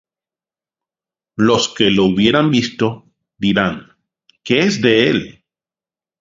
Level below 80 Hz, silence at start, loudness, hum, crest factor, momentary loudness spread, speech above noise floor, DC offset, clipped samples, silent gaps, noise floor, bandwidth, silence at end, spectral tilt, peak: -50 dBFS; 1.4 s; -15 LUFS; none; 18 dB; 19 LU; over 75 dB; under 0.1%; under 0.1%; none; under -90 dBFS; 7.8 kHz; 0.9 s; -5 dB/octave; 0 dBFS